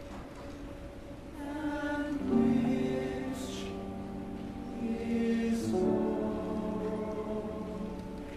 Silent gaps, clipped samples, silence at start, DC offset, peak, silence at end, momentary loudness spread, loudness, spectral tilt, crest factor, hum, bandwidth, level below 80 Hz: none; under 0.1%; 0 s; under 0.1%; -16 dBFS; 0 s; 15 LU; -34 LUFS; -7 dB/octave; 16 dB; none; 13 kHz; -50 dBFS